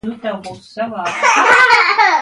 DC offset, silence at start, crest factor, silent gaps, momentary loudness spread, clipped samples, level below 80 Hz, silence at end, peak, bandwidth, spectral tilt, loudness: under 0.1%; 0.05 s; 14 dB; none; 17 LU; under 0.1%; -56 dBFS; 0 s; 0 dBFS; 11.5 kHz; -1.5 dB/octave; -10 LUFS